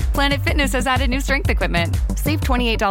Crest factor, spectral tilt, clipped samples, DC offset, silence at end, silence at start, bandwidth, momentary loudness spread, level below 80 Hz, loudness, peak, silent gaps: 16 dB; -5 dB/octave; under 0.1%; under 0.1%; 0 s; 0 s; 17 kHz; 3 LU; -22 dBFS; -19 LUFS; -2 dBFS; none